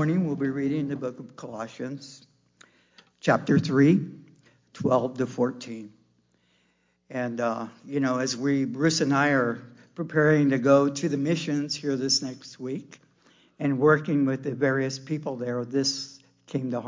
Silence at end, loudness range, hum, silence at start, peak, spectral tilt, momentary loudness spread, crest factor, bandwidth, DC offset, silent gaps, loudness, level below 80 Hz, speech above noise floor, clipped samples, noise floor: 0 s; 7 LU; 60 Hz at -55 dBFS; 0 s; -8 dBFS; -5.5 dB/octave; 16 LU; 18 dB; 7.6 kHz; under 0.1%; none; -25 LUFS; -70 dBFS; 44 dB; under 0.1%; -69 dBFS